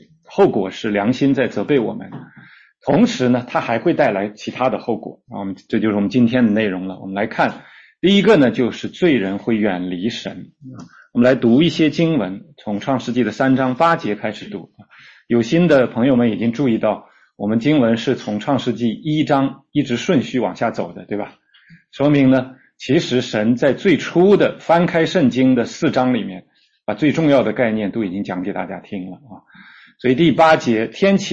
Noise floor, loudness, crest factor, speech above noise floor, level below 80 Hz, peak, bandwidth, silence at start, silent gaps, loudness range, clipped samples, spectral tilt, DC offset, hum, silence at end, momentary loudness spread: -46 dBFS; -17 LUFS; 14 dB; 29 dB; -54 dBFS; -2 dBFS; 7.8 kHz; 0.3 s; none; 4 LU; under 0.1%; -6.5 dB/octave; under 0.1%; none; 0 s; 14 LU